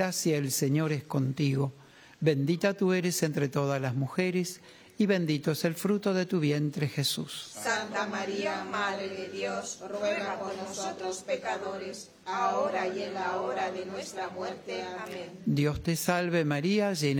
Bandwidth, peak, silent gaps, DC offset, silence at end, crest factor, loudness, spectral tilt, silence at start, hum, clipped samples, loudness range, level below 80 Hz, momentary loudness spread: over 20 kHz; -12 dBFS; none; under 0.1%; 0 s; 18 dB; -30 LUFS; -5 dB/octave; 0 s; none; under 0.1%; 4 LU; -62 dBFS; 9 LU